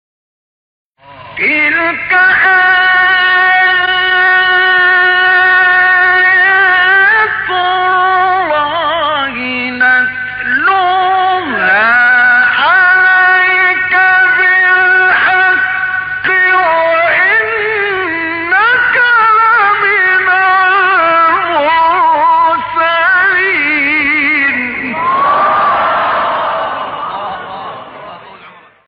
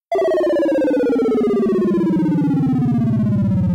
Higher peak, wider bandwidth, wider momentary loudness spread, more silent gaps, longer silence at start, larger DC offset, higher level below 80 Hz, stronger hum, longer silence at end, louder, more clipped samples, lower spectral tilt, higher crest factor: first, -2 dBFS vs -10 dBFS; second, 5.2 kHz vs 11 kHz; first, 8 LU vs 1 LU; neither; first, 1.1 s vs 0.1 s; neither; second, -50 dBFS vs -44 dBFS; neither; first, 0.4 s vs 0 s; first, -8 LUFS vs -17 LUFS; neither; second, -7.5 dB/octave vs -9.5 dB/octave; about the same, 8 dB vs 6 dB